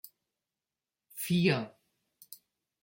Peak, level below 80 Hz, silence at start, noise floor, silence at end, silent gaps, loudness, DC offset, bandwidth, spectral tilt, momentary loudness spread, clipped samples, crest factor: -14 dBFS; -72 dBFS; 1.15 s; under -90 dBFS; 0.5 s; none; -30 LUFS; under 0.1%; 16.5 kHz; -5.5 dB/octave; 24 LU; under 0.1%; 22 dB